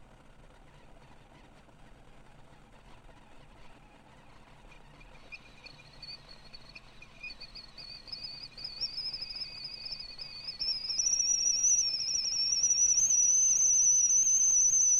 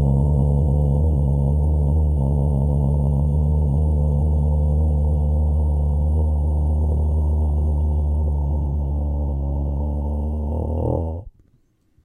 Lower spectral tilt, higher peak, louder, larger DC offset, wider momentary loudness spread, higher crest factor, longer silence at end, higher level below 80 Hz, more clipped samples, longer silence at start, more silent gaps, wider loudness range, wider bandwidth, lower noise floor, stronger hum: second, 2.5 dB/octave vs -12 dB/octave; second, -18 dBFS vs -8 dBFS; second, -25 LUFS vs -21 LUFS; neither; first, 24 LU vs 5 LU; about the same, 14 dB vs 12 dB; second, 0 s vs 0.75 s; second, -60 dBFS vs -20 dBFS; neither; about the same, 0 s vs 0 s; neither; first, 25 LU vs 4 LU; first, 14 kHz vs 1.2 kHz; second, -56 dBFS vs -60 dBFS; neither